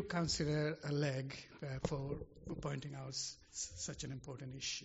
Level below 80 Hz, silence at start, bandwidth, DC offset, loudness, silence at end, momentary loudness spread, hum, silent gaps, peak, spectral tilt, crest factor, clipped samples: -60 dBFS; 0 s; 8 kHz; under 0.1%; -42 LUFS; 0 s; 11 LU; none; none; -22 dBFS; -5 dB/octave; 18 dB; under 0.1%